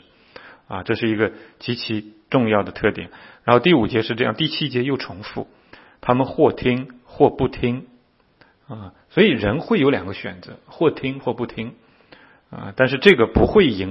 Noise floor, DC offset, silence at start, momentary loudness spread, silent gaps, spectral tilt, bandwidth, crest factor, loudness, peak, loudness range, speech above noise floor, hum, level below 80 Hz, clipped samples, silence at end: -57 dBFS; under 0.1%; 0.45 s; 18 LU; none; -8 dB/octave; 6.6 kHz; 20 dB; -19 LUFS; 0 dBFS; 3 LU; 37 dB; none; -42 dBFS; under 0.1%; 0 s